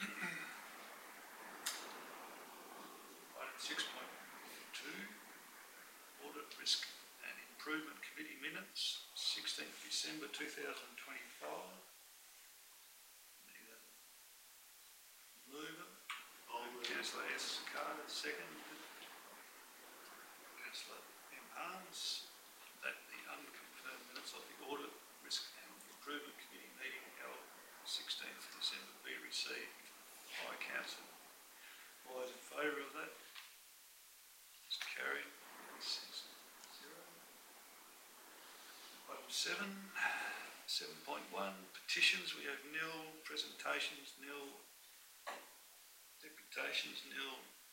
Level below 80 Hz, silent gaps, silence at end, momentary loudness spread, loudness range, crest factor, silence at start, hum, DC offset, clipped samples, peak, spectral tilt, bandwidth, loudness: under -90 dBFS; none; 0 s; 17 LU; 12 LU; 26 dB; 0 s; none; under 0.1%; under 0.1%; -22 dBFS; -0.5 dB/octave; 16 kHz; -45 LUFS